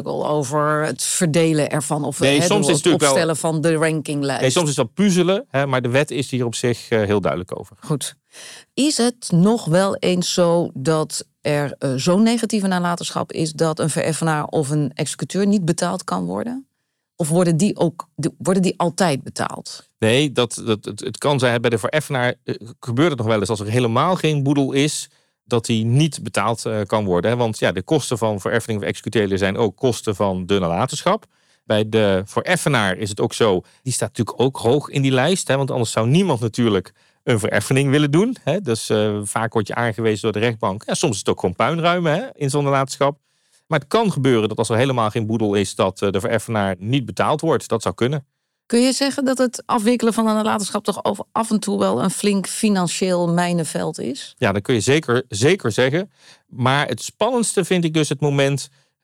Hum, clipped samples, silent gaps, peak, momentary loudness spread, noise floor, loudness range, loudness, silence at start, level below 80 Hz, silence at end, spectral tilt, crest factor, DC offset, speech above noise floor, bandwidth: none; under 0.1%; none; -6 dBFS; 7 LU; -75 dBFS; 3 LU; -19 LUFS; 0 s; -60 dBFS; 0.35 s; -5 dB/octave; 14 dB; under 0.1%; 56 dB; 16 kHz